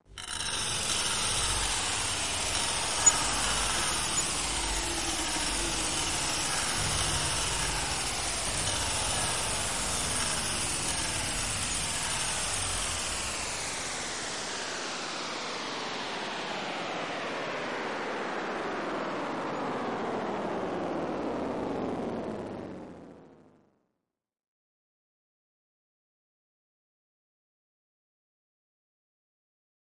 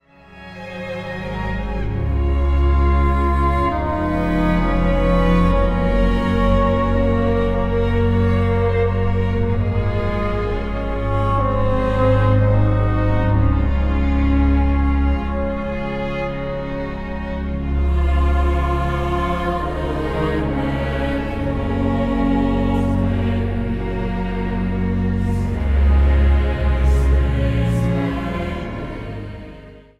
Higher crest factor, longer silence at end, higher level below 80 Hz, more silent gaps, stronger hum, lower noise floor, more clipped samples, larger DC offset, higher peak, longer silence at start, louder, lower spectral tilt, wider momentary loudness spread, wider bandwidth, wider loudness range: first, 24 dB vs 14 dB; first, 5.5 s vs 0.2 s; second, -48 dBFS vs -22 dBFS; neither; neither; first, -84 dBFS vs -41 dBFS; neither; first, 0.4% vs under 0.1%; second, -10 dBFS vs -4 dBFS; second, 0 s vs 0.3 s; second, -29 LUFS vs -19 LUFS; second, -1.5 dB/octave vs -8.5 dB/octave; about the same, 7 LU vs 9 LU; first, 11.5 kHz vs 6.6 kHz; first, 8 LU vs 4 LU